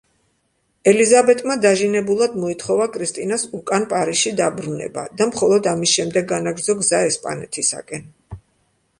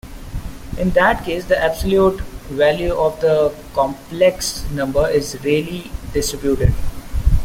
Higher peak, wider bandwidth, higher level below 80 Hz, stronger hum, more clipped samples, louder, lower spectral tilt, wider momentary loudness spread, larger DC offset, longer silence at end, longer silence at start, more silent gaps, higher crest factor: about the same, -2 dBFS vs -2 dBFS; second, 11.5 kHz vs 16.5 kHz; second, -56 dBFS vs -26 dBFS; neither; neither; about the same, -18 LUFS vs -18 LUFS; second, -3 dB/octave vs -5 dB/octave; about the same, 11 LU vs 13 LU; neither; first, 0.6 s vs 0 s; first, 0.85 s vs 0.05 s; neither; about the same, 18 dB vs 16 dB